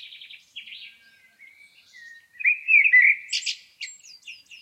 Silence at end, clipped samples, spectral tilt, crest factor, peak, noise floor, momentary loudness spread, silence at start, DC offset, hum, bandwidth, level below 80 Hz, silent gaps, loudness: 0.3 s; under 0.1%; 5.5 dB/octave; 18 dB; -6 dBFS; -56 dBFS; 27 LU; 0.55 s; under 0.1%; none; 13 kHz; -88 dBFS; none; -18 LUFS